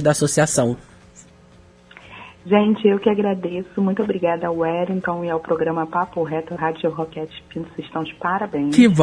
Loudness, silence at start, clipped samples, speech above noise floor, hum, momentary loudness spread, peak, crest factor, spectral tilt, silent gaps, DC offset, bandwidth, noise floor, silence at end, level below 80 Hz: -20 LUFS; 0 s; under 0.1%; 29 dB; 60 Hz at -55 dBFS; 14 LU; -2 dBFS; 18 dB; -5.5 dB/octave; none; under 0.1%; 11 kHz; -49 dBFS; 0 s; -54 dBFS